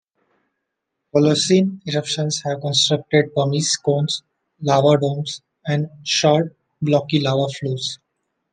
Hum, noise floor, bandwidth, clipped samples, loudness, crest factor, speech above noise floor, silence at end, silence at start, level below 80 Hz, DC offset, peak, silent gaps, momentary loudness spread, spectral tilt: none; -78 dBFS; 9.8 kHz; under 0.1%; -19 LUFS; 18 dB; 59 dB; 0.55 s; 1.15 s; -62 dBFS; under 0.1%; -2 dBFS; none; 11 LU; -4.5 dB/octave